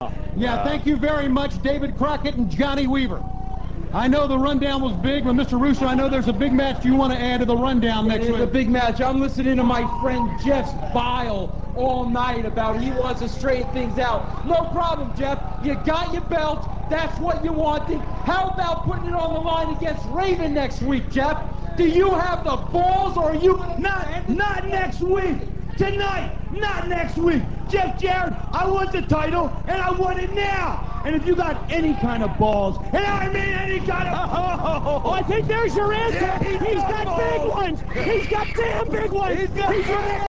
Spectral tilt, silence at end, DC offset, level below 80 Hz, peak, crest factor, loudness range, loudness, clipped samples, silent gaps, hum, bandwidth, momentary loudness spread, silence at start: -7 dB/octave; 0.05 s; 4%; -30 dBFS; -6 dBFS; 16 dB; 4 LU; -22 LUFS; under 0.1%; none; none; 8 kHz; 6 LU; 0 s